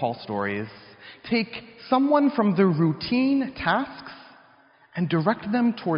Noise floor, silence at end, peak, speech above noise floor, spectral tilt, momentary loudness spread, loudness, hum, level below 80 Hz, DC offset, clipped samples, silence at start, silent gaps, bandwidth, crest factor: -56 dBFS; 0 s; -8 dBFS; 33 dB; -5.5 dB/octave; 18 LU; -24 LUFS; none; -60 dBFS; under 0.1%; under 0.1%; 0 s; none; 5.4 kHz; 16 dB